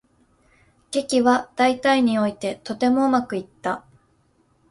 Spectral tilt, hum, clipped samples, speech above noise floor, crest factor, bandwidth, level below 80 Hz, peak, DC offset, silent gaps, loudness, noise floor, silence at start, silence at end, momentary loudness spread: -4.5 dB/octave; none; under 0.1%; 42 dB; 18 dB; 11.5 kHz; -62 dBFS; -4 dBFS; under 0.1%; none; -21 LUFS; -62 dBFS; 0.9 s; 0.9 s; 10 LU